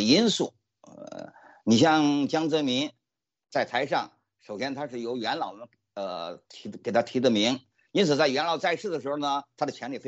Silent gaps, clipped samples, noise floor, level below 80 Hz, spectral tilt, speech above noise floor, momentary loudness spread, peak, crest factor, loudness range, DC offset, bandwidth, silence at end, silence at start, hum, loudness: none; under 0.1%; -48 dBFS; -74 dBFS; -4.5 dB/octave; 22 dB; 20 LU; -8 dBFS; 20 dB; 6 LU; under 0.1%; 8.2 kHz; 0 s; 0 s; none; -27 LUFS